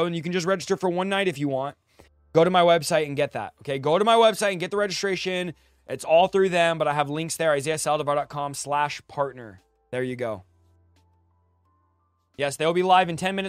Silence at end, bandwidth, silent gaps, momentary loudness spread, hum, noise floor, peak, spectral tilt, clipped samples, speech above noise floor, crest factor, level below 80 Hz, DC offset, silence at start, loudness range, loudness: 0 s; 15.5 kHz; none; 12 LU; none; -68 dBFS; -4 dBFS; -4.5 dB/octave; under 0.1%; 45 dB; 20 dB; -64 dBFS; under 0.1%; 0 s; 10 LU; -23 LUFS